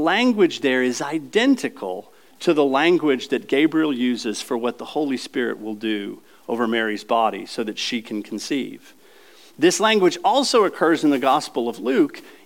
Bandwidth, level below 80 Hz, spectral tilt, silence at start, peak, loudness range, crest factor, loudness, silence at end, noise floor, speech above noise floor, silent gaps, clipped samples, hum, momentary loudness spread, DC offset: 17 kHz; -80 dBFS; -4 dB/octave; 0 s; -6 dBFS; 5 LU; 16 dB; -21 LUFS; 0.15 s; -50 dBFS; 29 dB; none; under 0.1%; none; 11 LU; 0.2%